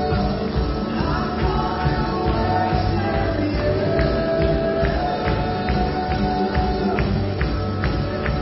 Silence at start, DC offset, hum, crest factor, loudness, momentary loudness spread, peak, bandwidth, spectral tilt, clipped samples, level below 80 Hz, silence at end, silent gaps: 0 s; under 0.1%; none; 16 dB; -21 LUFS; 3 LU; -6 dBFS; 5.8 kHz; -10.5 dB/octave; under 0.1%; -28 dBFS; 0 s; none